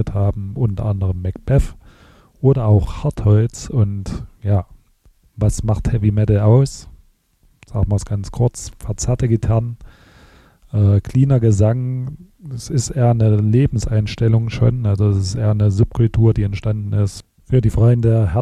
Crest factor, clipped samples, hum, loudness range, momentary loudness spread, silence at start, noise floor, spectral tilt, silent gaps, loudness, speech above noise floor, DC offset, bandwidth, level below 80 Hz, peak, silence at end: 14 dB; under 0.1%; none; 4 LU; 12 LU; 0 s; -57 dBFS; -7.5 dB/octave; none; -17 LUFS; 41 dB; under 0.1%; 10.5 kHz; -32 dBFS; -4 dBFS; 0 s